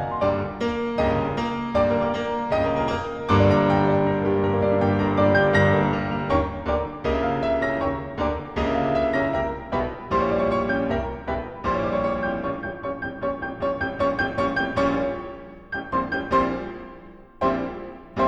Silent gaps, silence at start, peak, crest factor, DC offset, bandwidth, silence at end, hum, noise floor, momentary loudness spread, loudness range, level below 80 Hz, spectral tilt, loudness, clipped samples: none; 0 s; -6 dBFS; 16 dB; under 0.1%; 8.4 kHz; 0 s; none; -44 dBFS; 10 LU; 6 LU; -40 dBFS; -7.5 dB/octave; -23 LUFS; under 0.1%